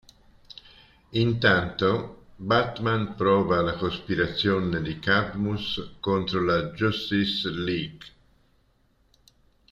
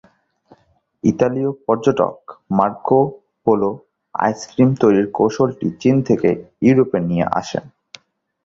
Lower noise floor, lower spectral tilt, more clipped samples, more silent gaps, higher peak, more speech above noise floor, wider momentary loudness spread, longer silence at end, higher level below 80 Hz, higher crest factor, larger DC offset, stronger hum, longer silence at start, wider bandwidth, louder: first, -65 dBFS vs -58 dBFS; about the same, -7 dB/octave vs -7.5 dB/octave; neither; neither; second, -6 dBFS vs 0 dBFS; about the same, 40 dB vs 41 dB; about the same, 10 LU vs 8 LU; first, 1.65 s vs 0.8 s; about the same, -52 dBFS vs -52 dBFS; about the same, 20 dB vs 18 dB; neither; neither; about the same, 1.1 s vs 1.05 s; about the same, 7.8 kHz vs 7.6 kHz; second, -25 LUFS vs -18 LUFS